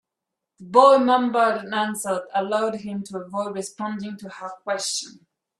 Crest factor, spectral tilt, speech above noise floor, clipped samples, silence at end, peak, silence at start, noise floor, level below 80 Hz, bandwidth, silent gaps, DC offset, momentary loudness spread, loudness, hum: 22 dB; -3.5 dB/octave; 62 dB; under 0.1%; 0.5 s; -2 dBFS; 0.6 s; -84 dBFS; -72 dBFS; 13 kHz; none; under 0.1%; 18 LU; -22 LUFS; none